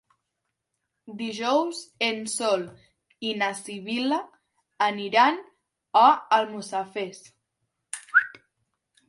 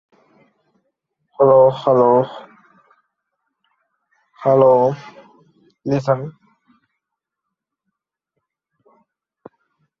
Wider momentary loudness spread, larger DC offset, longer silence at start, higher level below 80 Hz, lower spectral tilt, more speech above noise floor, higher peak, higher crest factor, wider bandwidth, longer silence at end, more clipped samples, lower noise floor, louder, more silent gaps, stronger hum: second, 16 LU vs 20 LU; neither; second, 1.05 s vs 1.4 s; second, -78 dBFS vs -64 dBFS; second, -2.5 dB/octave vs -8.5 dB/octave; second, 57 dB vs 67 dB; about the same, -4 dBFS vs -2 dBFS; about the same, 22 dB vs 18 dB; first, 11.5 kHz vs 6.6 kHz; second, 0.75 s vs 3.7 s; neither; about the same, -81 dBFS vs -81 dBFS; second, -25 LUFS vs -15 LUFS; neither; neither